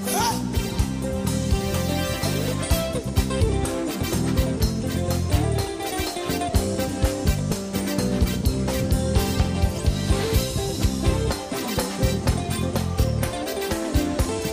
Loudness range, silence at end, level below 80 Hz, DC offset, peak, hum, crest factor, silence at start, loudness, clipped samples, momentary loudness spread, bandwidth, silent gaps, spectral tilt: 1 LU; 0 s; -30 dBFS; under 0.1%; -8 dBFS; none; 16 dB; 0 s; -24 LUFS; under 0.1%; 4 LU; 15.5 kHz; none; -5 dB/octave